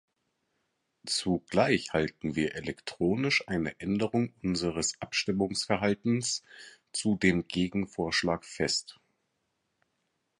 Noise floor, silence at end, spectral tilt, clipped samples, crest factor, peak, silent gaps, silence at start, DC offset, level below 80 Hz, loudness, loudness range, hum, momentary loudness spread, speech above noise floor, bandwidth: -79 dBFS; 1.5 s; -4 dB/octave; under 0.1%; 22 dB; -10 dBFS; none; 1.05 s; under 0.1%; -56 dBFS; -30 LUFS; 1 LU; none; 6 LU; 49 dB; 11.5 kHz